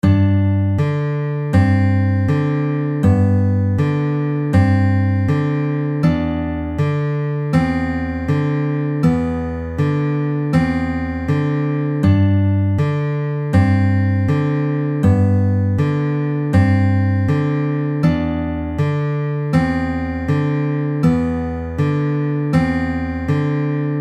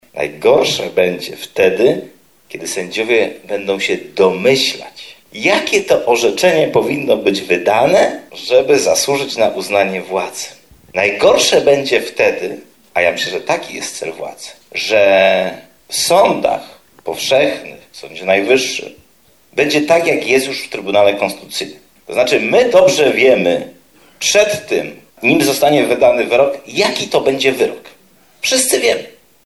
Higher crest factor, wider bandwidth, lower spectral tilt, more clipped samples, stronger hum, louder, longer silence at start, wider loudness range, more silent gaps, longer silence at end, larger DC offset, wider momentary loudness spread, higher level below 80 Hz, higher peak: about the same, 14 dB vs 14 dB; second, 8.4 kHz vs 14 kHz; first, -9 dB/octave vs -3 dB/octave; neither; neither; second, -18 LUFS vs -14 LUFS; about the same, 0.05 s vs 0.15 s; about the same, 2 LU vs 3 LU; neither; second, 0 s vs 0.35 s; second, under 0.1% vs 0.1%; second, 6 LU vs 13 LU; first, -36 dBFS vs -54 dBFS; about the same, -2 dBFS vs 0 dBFS